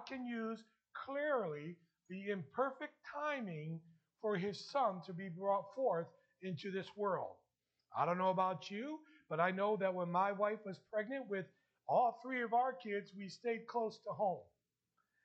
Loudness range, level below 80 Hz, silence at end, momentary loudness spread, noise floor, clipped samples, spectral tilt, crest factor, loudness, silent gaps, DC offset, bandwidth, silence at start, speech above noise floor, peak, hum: 5 LU; under -90 dBFS; 0.8 s; 14 LU; -86 dBFS; under 0.1%; -6.5 dB/octave; 20 dB; -40 LUFS; none; under 0.1%; 8.2 kHz; 0 s; 46 dB; -20 dBFS; none